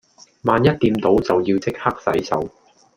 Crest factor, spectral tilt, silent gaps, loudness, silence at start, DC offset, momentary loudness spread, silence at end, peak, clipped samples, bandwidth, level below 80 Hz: 18 dB; -7 dB/octave; none; -19 LUFS; 0.45 s; under 0.1%; 8 LU; 0.5 s; -2 dBFS; under 0.1%; 16 kHz; -46 dBFS